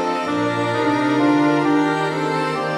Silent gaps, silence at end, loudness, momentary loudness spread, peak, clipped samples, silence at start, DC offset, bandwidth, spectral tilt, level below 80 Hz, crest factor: none; 0 s; -19 LUFS; 5 LU; -6 dBFS; under 0.1%; 0 s; under 0.1%; 11.5 kHz; -6 dB/octave; -62 dBFS; 14 dB